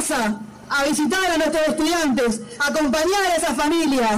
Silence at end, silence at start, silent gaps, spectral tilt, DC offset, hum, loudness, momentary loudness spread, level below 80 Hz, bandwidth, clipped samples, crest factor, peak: 0 s; 0 s; none; -3 dB/octave; under 0.1%; none; -20 LUFS; 4 LU; -46 dBFS; 16 kHz; under 0.1%; 6 dB; -14 dBFS